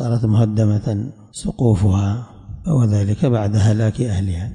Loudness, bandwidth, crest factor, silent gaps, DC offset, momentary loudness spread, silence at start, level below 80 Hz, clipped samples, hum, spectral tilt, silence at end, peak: -18 LUFS; 10.5 kHz; 12 dB; none; under 0.1%; 12 LU; 0 s; -40 dBFS; under 0.1%; none; -8 dB/octave; 0 s; -6 dBFS